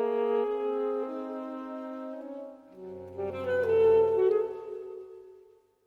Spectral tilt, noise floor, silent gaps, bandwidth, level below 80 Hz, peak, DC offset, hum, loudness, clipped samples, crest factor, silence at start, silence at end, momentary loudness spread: -7.5 dB/octave; -59 dBFS; none; 4.4 kHz; -72 dBFS; -14 dBFS; under 0.1%; 50 Hz at -80 dBFS; -29 LUFS; under 0.1%; 16 dB; 0 s; 0.45 s; 21 LU